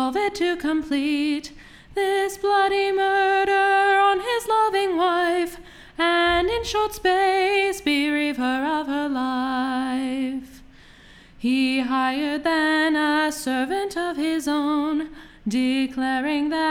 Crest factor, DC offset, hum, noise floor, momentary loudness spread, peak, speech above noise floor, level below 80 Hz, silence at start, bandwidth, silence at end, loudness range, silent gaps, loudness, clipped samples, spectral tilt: 14 dB; under 0.1%; none; -48 dBFS; 7 LU; -8 dBFS; 26 dB; -50 dBFS; 0 s; 16.5 kHz; 0 s; 5 LU; none; -22 LUFS; under 0.1%; -3.5 dB/octave